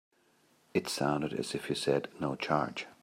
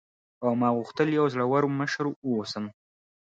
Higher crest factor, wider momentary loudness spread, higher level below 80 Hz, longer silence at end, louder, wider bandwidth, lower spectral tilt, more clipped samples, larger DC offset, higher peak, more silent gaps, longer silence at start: about the same, 22 dB vs 18 dB; second, 5 LU vs 9 LU; about the same, -68 dBFS vs -72 dBFS; second, 0.1 s vs 0.6 s; second, -33 LUFS vs -27 LUFS; first, 16 kHz vs 7.8 kHz; second, -5 dB/octave vs -6.5 dB/octave; neither; neither; about the same, -12 dBFS vs -10 dBFS; second, none vs 2.16-2.22 s; first, 0.75 s vs 0.4 s